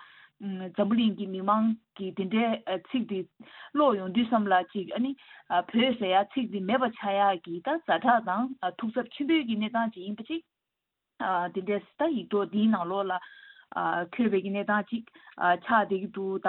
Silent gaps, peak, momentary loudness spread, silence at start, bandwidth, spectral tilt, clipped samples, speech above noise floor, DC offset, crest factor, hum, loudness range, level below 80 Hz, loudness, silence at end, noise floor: none; -10 dBFS; 11 LU; 0 s; 4.2 kHz; -9.5 dB/octave; under 0.1%; 58 dB; under 0.1%; 20 dB; none; 4 LU; -74 dBFS; -28 LUFS; 0 s; -86 dBFS